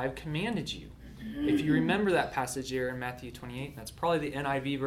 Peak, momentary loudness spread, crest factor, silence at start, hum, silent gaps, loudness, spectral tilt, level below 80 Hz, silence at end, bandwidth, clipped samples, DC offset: -16 dBFS; 15 LU; 16 dB; 0 s; none; none; -31 LUFS; -5.5 dB/octave; -52 dBFS; 0 s; 16 kHz; under 0.1%; under 0.1%